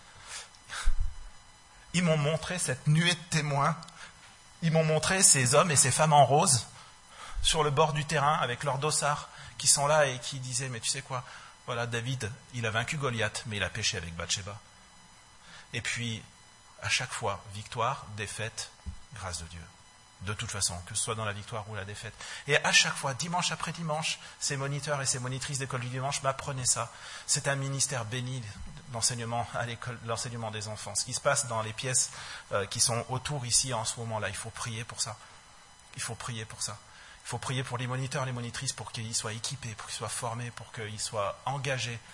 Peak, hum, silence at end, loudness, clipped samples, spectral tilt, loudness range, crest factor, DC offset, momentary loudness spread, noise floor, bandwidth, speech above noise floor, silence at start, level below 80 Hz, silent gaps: -6 dBFS; none; 0 s; -29 LUFS; under 0.1%; -3 dB/octave; 11 LU; 26 dB; under 0.1%; 17 LU; -55 dBFS; 11.5 kHz; 25 dB; 0 s; -48 dBFS; none